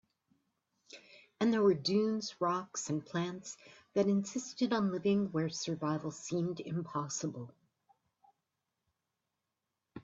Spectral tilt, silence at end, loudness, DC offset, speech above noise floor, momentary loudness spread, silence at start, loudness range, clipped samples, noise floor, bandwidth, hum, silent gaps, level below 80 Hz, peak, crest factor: -5.5 dB/octave; 0 s; -34 LUFS; under 0.1%; 54 dB; 18 LU; 0.95 s; 8 LU; under 0.1%; -88 dBFS; 8 kHz; none; none; -76 dBFS; -18 dBFS; 18 dB